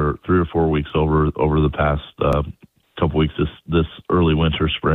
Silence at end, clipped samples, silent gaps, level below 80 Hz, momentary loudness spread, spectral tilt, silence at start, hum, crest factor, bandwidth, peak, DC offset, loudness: 0 s; under 0.1%; none; -30 dBFS; 5 LU; -9 dB/octave; 0 s; none; 16 dB; 4.1 kHz; -2 dBFS; under 0.1%; -19 LUFS